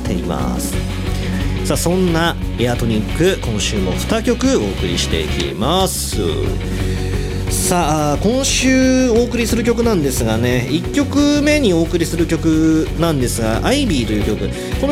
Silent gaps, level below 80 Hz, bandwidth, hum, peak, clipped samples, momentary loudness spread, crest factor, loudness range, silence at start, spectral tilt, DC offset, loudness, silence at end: none; -26 dBFS; 16.5 kHz; none; -2 dBFS; under 0.1%; 7 LU; 14 dB; 3 LU; 0 s; -5 dB/octave; under 0.1%; -16 LUFS; 0 s